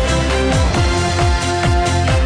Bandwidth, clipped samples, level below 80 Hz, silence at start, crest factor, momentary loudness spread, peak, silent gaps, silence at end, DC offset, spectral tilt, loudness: 10.5 kHz; under 0.1%; -20 dBFS; 0 s; 10 dB; 1 LU; -4 dBFS; none; 0 s; under 0.1%; -5 dB/octave; -16 LUFS